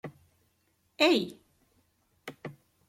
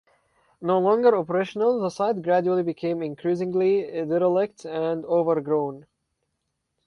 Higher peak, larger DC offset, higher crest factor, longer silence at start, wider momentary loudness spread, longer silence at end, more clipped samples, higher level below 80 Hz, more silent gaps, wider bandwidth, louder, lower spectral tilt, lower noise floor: second, -12 dBFS vs -8 dBFS; neither; first, 22 dB vs 16 dB; second, 0.05 s vs 0.6 s; first, 23 LU vs 8 LU; second, 0.35 s vs 1.05 s; neither; second, -76 dBFS vs -68 dBFS; neither; first, 15.5 kHz vs 10.5 kHz; second, -27 LUFS vs -24 LUFS; second, -4 dB/octave vs -7.5 dB/octave; second, -73 dBFS vs -78 dBFS